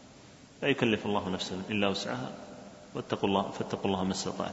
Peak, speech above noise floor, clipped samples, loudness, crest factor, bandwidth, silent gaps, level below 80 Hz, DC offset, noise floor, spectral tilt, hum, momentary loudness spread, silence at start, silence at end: -12 dBFS; 22 dB; under 0.1%; -32 LUFS; 22 dB; 8 kHz; none; -64 dBFS; under 0.1%; -53 dBFS; -5 dB/octave; none; 13 LU; 0 s; 0 s